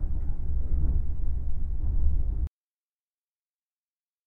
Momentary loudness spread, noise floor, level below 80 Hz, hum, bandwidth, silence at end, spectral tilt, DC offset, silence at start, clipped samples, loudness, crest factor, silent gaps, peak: 5 LU; under -90 dBFS; -28 dBFS; none; 1.1 kHz; 1.8 s; -11.5 dB/octave; under 0.1%; 0 s; under 0.1%; -32 LUFS; 14 dB; none; -12 dBFS